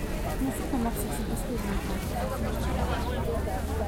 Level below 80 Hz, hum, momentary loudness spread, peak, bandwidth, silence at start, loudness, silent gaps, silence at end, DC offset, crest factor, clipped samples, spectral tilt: -34 dBFS; none; 2 LU; -16 dBFS; 16.5 kHz; 0 s; -31 LUFS; none; 0 s; under 0.1%; 14 dB; under 0.1%; -6 dB/octave